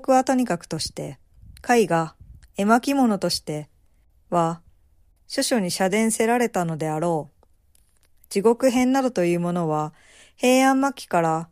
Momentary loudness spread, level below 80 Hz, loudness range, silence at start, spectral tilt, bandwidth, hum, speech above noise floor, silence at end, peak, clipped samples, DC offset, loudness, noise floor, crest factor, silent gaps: 13 LU; -56 dBFS; 3 LU; 0 s; -5 dB/octave; 15.5 kHz; none; 38 dB; 0.05 s; -4 dBFS; under 0.1%; under 0.1%; -22 LUFS; -59 dBFS; 18 dB; none